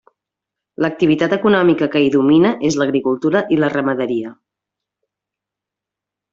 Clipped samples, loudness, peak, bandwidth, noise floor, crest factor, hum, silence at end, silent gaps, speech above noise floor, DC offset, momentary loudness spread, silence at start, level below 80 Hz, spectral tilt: under 0.1%; -16 LUFS; -2 dBFS; 7.8 kHz; -85 dBFS; 14 dB; none; 2 s; none; 70 dB; under 0.1%; 9 LU; 0.8 s; -56 dBFS; -6 dB/octave